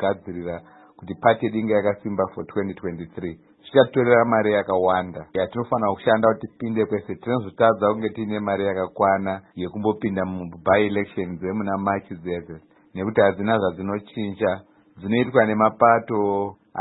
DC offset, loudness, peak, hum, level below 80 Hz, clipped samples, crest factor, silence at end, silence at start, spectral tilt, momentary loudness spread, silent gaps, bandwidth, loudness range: under 0.1%; -22 LUFS; -2 dBFS; none; -58 dBFS; under 0.1%; 20 dB; 0 s; 0 s; -11.5 dB/octave; 14 LU; none; 4.1 kHz; 4 LU